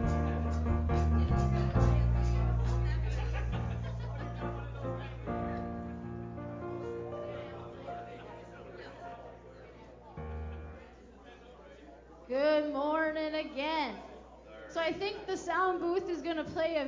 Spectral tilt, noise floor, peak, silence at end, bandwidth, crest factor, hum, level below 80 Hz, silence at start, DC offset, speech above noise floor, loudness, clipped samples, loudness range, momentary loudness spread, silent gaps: -7.5 dB/octave; -53 dBFS; -16 dBFS; 0 s; 7.6 kHz; 18 dB; none; -38 dBFS; 0 s; under 0.1%; 21 dB; -34 LUFS; under 0.1%; 15 LU; 23 LU; none